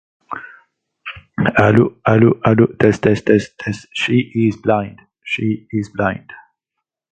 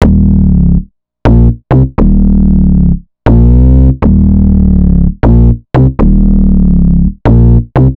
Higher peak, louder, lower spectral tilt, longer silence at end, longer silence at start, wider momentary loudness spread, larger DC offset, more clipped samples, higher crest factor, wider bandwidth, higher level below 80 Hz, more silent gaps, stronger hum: about the same, 0 dBFS vs 0 dBFS; second, -16 LUFS vs -8 LUFS; second, -7.5 dB/octave vs -11 dB/octave; first, 0.75 s vs 0.05 s; first, 0.3 s vs 0 s; first, 18 LU vs 4 LU; neither; second, under 0.1% vs 4%; first, 16 dB vs 6 dB; first, 9 kHz vs 4.2 kHz; second, -46 dBFS vs -10 dBFS; neither; neither